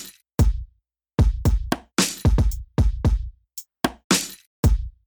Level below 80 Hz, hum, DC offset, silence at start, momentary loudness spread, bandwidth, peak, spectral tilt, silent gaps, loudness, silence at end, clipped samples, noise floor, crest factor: -24 dBFS; none; under 0.1%; 0 s; 12 LU; over 20 kHz; -6 dBFS; -4.5 dB/octave; 4.04-4.10 s, 4.47-4.63 s; -23 LUFS; 0.15 s; under 0.1%; -63 dBFS; 16 dB